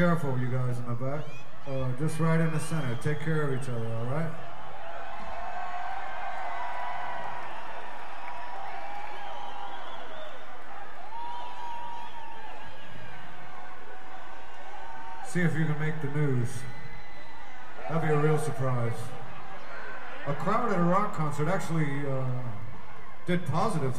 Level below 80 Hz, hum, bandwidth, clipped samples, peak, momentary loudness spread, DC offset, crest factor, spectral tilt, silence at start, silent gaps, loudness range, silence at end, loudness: -58 dBFS; none; 14 kHz; under 0.1%; -10 dBFS; 17 LU; 5%; 20 dB; -7 dB/octave; 0 s; none; 11 LU; 0 s; -32 LUFS